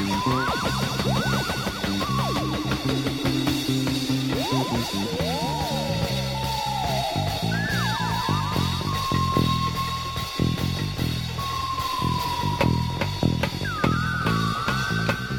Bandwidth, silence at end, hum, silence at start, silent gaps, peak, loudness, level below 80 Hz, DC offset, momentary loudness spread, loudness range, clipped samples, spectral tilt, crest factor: 17.5 kHz; 0 s; none; 0 s; none; -6 dBFS; -25 LUFS; -40 dBFS; under 0.1%; 3 LU; 1 LU; under 0.1%; -5 dB/octave; 20 dB